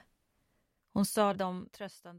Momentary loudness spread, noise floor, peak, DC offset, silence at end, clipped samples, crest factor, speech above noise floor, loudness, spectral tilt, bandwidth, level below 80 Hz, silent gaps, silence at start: 16 LU; -77 dBFS; -16 dBFS; under 0.1%; 0 s; under 0.1%; 20 dB; 44 dB; -33 LUFS; -5 dB/octave; 16 kHz; -68 dBFS; none; 0.95 s